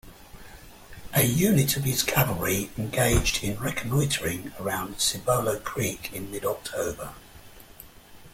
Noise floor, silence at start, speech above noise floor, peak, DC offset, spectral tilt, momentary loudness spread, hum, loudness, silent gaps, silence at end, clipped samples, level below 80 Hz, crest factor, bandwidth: -48 dBFS; 0.05 s; 22 dB; -8 dBFS; under 0.1%; -4 dB/octave; 11 LU; none; -26 LUFS; none; 0.05 s; under 0.1%; -42 dBFS; 20 dB; 16.5 kHz